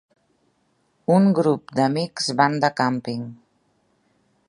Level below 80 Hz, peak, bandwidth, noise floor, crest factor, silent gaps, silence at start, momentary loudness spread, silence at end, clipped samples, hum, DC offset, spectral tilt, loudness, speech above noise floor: -68 dBFS; -2 dBFS; 11.5 kHz; -67 dBFS; 22 dB; none; 1.1 s; 14 LU; 1.15 s; under 0.1%; none; under 0.1%; -6 dB/octave; -21 LUFS; 46 dB